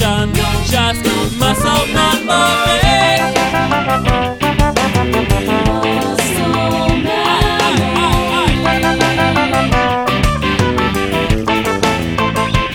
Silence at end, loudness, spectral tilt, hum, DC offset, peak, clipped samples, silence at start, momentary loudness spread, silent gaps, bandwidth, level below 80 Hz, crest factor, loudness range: 0 s; -13 LUFS; -4.5 dB/octave; none; 0.2%; 0 dBFS; under 0.1%; 0 s; 4 LU; none; over 20 kHz; -24 dBFS; 14 dB; 2 LU